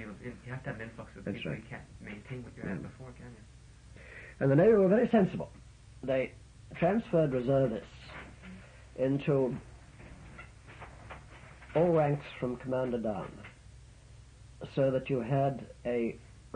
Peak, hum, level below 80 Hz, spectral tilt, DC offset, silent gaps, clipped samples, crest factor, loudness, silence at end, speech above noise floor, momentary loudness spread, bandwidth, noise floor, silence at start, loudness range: -14 dBFS; none; -56 dBFS; -8.5 dB/octave; under 0.1%; none; under 0.1%; 18 dB; -31 LUFS; 0.1 s; 23 dB; 23 LU; 10 kHz; -54 dBFS; 0 s; 13 LU